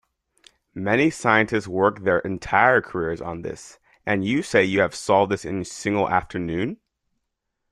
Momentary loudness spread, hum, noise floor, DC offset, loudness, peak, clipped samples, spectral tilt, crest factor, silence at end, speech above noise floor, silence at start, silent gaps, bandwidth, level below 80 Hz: 13 LU; none; -78 dBFS; under 0.1%; -22 LUFS; -2 dBFS; under 0.1%; -5.5 dB/octave; 22 dB; 0.95 s; 57 dB; 0.75 s; none; 12.5 kHz; -52 dBFS